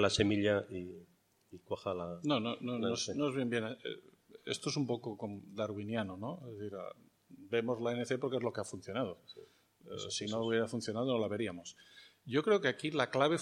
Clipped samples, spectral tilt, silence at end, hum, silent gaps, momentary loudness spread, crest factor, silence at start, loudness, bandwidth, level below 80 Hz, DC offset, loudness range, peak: under 0.1%; -5 dB/octave; 0 s; none; none; 17 LU; 24 dB; 0 s; -36 LUFS; 13 kHz; -70 dBFS; under 0.1%; 5 LU; -14 dBFS